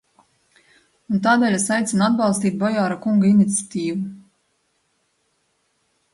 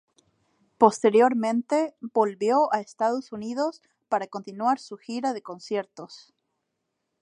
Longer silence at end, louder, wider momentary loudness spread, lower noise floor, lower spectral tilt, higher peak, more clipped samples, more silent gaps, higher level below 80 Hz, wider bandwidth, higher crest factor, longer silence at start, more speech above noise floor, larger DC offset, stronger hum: first, 1.95 s vs 1.05 s; first, -19 LUFS vs -25 LUFS; second, 9 LU vs 15 LU; second, -68 dBFS vs -80 dBFS; about the same, -5 dB/octave vs -5 dB/octave; about the same, -4 dBFS vs -2 dBFS; neither; neither; first, -64 dBFS vs -76 dBFS; about the same, 11.5 kHz vs 11 kHz; second, 18 dB vs 24 dB; first, 1.1 s vs 0.8 s; second, 50 dB vs 55 dB; neither; neither